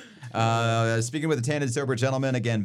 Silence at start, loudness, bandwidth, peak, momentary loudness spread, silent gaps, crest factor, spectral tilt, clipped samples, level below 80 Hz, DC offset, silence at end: 0 s; -26 LUFS; 12.5 kHz; -8 dBFS; 3 LU; none; 16 dB; -5.5 dB/octave; under 0.1%; -68 dBFS; under 0.1%; 0 s